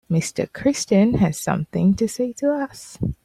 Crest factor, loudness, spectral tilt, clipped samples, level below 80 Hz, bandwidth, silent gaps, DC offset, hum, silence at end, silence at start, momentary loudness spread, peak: 14 dB; -21 LUFS; -6 dB/octave; under 0.1%; -44 dBFS; 14.5 kHz; none; under 0.1%; none; 0.1 s; 0.1 s; 9 LU; -6 dBFS